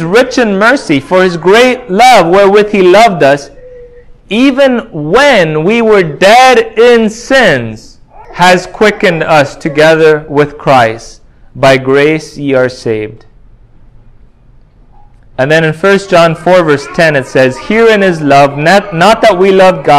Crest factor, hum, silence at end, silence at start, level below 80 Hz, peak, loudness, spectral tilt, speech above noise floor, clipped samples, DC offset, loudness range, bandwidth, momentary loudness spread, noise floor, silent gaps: 8 dB; none; 0 s; 0 s; -38 dBFS; 0 dBFS; -7 LUFS; -5 dB/octave; 33 dB; 5%; under 0.1%; 6 LU; 16 kHz; 8 LU; -39 dBFS; none